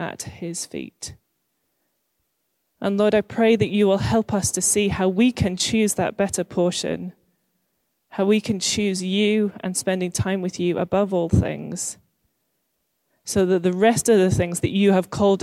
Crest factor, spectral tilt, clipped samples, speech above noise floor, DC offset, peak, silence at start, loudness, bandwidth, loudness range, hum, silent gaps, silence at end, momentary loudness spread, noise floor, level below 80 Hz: 16 dB; -4.5 dB/octave; under 0.1%; 53 dB; under 0.1%; -6 dBFS; 0 s; -21 LUFS; 14.5 kHz; 5 LU; none; none; 0 s; 12 LU; -73 dBFS; -46 dBFS